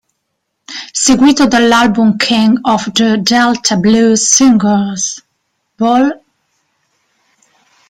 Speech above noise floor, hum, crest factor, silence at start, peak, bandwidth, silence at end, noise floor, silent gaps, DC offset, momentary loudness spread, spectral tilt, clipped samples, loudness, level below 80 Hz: 60 dB; none; 12 dB; 0.7 s; 0 dBFS; 15.5 kHz; 1.75 s; -69 dBFS; none; under 0.1%; 11 LU; -3.5 dB/octave; under 0.1%; -10 LUFS; -46 dBFS